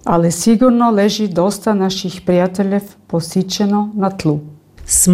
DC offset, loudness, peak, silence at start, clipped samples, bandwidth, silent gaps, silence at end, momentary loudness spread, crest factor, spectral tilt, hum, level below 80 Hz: under 0.1%; -15 LUFS; -2 dBFS; 0.05 s; under 0.1%; 16 kHz; none; 0 s; 8 LU; 12 dB; -5 dB/octave; none; -42 dBFS